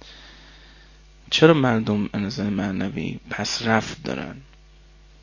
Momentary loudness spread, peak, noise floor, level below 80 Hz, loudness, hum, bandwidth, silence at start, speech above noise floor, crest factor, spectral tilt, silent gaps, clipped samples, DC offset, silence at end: 15 LU; 0 dBFS; -50 dBFS; -48 dBFS; -22 LUFS; none; 7.4 kHz; 0.05 s; 28 dB; 24 dB; -5.5 dB/octave; none; under 0.1%; under 0.1%; 0.8 s